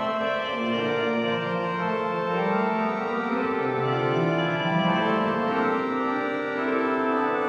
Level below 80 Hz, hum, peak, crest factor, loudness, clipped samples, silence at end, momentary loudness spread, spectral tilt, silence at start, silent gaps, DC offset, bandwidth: -66 dBFS; none; -12 dBFS; 14 dB; -25 LUFS; under 0.1%; 0 s; 3 LU; -7 dB/octave; 0 s; none; under 0.1%; 8.2 kHz